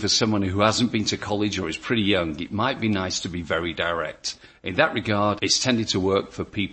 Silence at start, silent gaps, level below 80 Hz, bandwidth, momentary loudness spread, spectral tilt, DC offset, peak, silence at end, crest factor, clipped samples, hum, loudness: 0 s; none; -52 dBFS; 8.8 kHz; 8 LU; -4 dB/octave; under 0.1%; -2 dBFS; 0 s; 20 dB; under 0.1%; none; -23 LUFS